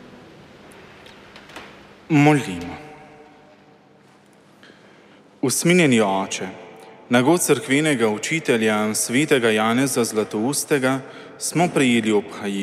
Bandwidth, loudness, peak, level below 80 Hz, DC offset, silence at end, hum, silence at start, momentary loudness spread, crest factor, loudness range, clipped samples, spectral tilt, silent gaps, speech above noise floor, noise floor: 16 kHz; -19 LUFS; -2 dBFS; -64 dBFS; under 0.1%; 0 s; none; 0.05 s; 17 LU; 20 dB; 5 LU; under 0.1%; -4.5 dB/octave; none; 33 dB; -52 dBFS